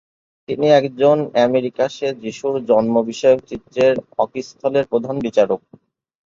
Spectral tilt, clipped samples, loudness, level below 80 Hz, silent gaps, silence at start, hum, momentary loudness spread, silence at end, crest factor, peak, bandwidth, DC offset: -6 dB/octave; under 0.1%; -18 LUFS; -58 dBFS; none; 0.5 s; none; 9 LU; 0.75 s; 16 dB; -2 dBFS; 7.6 kHz; under 0.1%